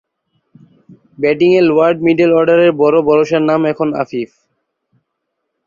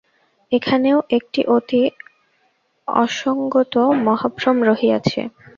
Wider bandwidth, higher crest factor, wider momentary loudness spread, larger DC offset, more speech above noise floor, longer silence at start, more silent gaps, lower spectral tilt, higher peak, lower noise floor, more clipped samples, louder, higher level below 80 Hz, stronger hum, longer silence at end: about the same, 7.2 kHz vs 7.2 kHz; second, 12 dB vs 18 dB; first, 9 LU vs 6 LU; neither; first, 61 dB vs 46 dB; first, 1.2 s vs 0.5 s; neither; first, -7.5 dB/octave vs -6 dB/octave; about the same, -2 dBFS vs -2 dBFS; first, -73 dBFS vs -64 dBFS; neither; first, -12 LUFS vs -18 LUFS; about the same, -56 dBFS vs -58 dBFS; neither; first, 1.4 s vs 0.3 s